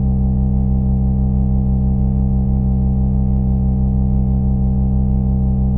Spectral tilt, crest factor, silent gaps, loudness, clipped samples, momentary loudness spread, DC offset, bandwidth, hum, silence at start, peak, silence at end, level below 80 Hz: -15 dB/octave; 10 dB; none; -17 LUFS; under 0.1%; 0 LU; under 0.1%; 1.3 kHz; none; 0 s; -4 dBFS; 0 s; -18 dBFS